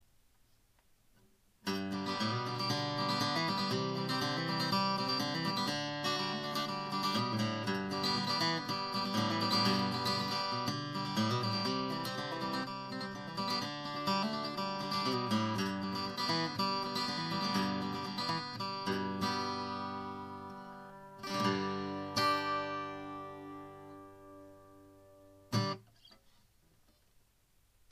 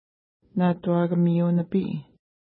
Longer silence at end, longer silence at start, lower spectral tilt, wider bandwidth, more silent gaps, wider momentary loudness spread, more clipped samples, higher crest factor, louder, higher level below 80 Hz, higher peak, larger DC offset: first, 1.75 s vs 0.5 s; first, 1.65 s vs 0.55 s; second, -4.5 dB/octave vs -13 dB/octave; first, 15.5 kHz vs 4.2 kHz; neither; about the same, 13 LU vs 11 LU; neither; first, 18 dB vs 12 dB; second, -35 LUFS vs -24 LUFS; second, -72 dBFS vs -66 dBFS; second, -18 dBFS vs -12 dBFS; neither